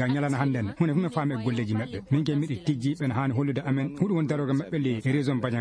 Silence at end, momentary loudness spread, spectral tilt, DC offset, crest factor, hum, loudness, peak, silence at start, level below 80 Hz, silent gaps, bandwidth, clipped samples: 0 s; 3 LU; -8 dB/octave; under 0.1%; 16 dB; none; -27 LUFS; -10 dBFS; 0 s; -60 dBFS; none; 10.5 kHz; under 0.1%